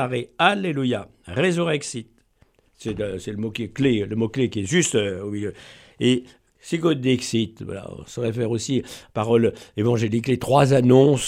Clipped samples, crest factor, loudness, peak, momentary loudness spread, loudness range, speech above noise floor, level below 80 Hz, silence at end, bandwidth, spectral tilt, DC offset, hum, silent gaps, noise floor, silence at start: under 0.1%; 20 dB; -22 LUFS; -2 dBFS; 13 LU; 4 LU; 39 dB; -54 dBFS; 0 s; 14 kHz; -5.5 dB/octave; under 0.1%; none; none; -60 dBFS; 0 s